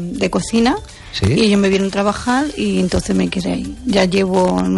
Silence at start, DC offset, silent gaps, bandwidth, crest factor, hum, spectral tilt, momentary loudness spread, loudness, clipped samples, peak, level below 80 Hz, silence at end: 0 s; under 0.1%; none; 11.5 kHz; 14 dB; none; -5.5 dB/octave; 7 LU; -16 LUFS; under 0.1%; -2 dBFS; -36 dBFS; 0 s